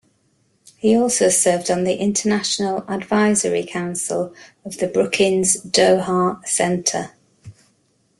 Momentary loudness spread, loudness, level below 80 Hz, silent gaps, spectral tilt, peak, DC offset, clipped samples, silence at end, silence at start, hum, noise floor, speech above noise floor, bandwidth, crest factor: 10 LU; -18 LUFS; -58 dBFS; none; -3.5 dB/octave; -2 dBFS; under 0.1%; under 0.1%; 0.7 s; 0.85 s; none; -63 dBFS; 44 dB; 12.5 kHz; 18 dB